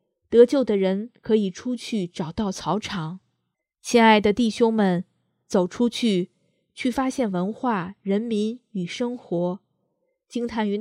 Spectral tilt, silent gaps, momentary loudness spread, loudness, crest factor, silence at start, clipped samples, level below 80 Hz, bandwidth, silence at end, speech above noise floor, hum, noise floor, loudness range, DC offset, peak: -5.5 dB/octave; none; 14 LU; -23 LUFS; 20 dB; 0.3 s; under 0.1%; -58 dBFS; 12.5 kHz; 0 s; 56 dB; none; -78 dBFS; 6 LU; under 0.1%; -2 dBFS